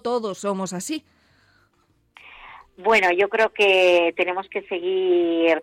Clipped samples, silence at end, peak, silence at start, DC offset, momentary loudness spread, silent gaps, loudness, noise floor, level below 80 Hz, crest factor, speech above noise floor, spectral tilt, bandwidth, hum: under 0.1%; 0 s; -6 dBFS; 0.05 s; under 0.1%; 12 LU; none; -20 LUFS; -64 dBFS; -64 dBFS; 16 dB; 44 dB; -3.5 dB/octave; 15 kHz; none